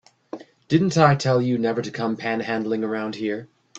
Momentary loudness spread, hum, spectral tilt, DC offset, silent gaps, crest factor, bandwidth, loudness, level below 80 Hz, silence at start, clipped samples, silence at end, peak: 20 LU; none; -6.5 dB/octave; under 0.1%; none; 22 dB; 8.2 kHz; -22 LUFS; -60 dBFS; 0.35 s; under 0.1%; 0 s; -2 dBFS